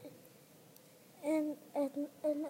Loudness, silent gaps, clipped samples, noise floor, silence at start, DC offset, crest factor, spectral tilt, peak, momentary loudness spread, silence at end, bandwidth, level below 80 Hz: -38 LUFS; none; under 0.1%; -61 dBFS; 0 s; under 0.1%; 16 dB; -5.5 dB/octave; -24 dBFS; 23 LU; 0 s; 16 kHz; under -90 dBFS